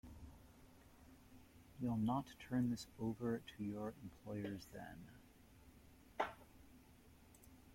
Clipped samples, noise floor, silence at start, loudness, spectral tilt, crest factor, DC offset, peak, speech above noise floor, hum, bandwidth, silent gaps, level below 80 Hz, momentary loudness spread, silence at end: under 0.1%; -66 dBFS; 0.05 s; -45 LUFS; -7 dB/octave; 24 dB; under 0.1%; -24 dBFS; 22 dB; none; 16.5 kHz; none; -68 dBFS; 25 LU; 0 s